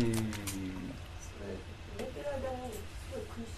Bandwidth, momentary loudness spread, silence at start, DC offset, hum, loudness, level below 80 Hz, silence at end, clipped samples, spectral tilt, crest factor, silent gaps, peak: 14 kHz; 9 LU; 0 s; under 0.1%; none; -41 LUFS; -50 dBFS; 0 s; under 0.1%; -5.5 dB/octave; 20 dB; none; -20 dBFS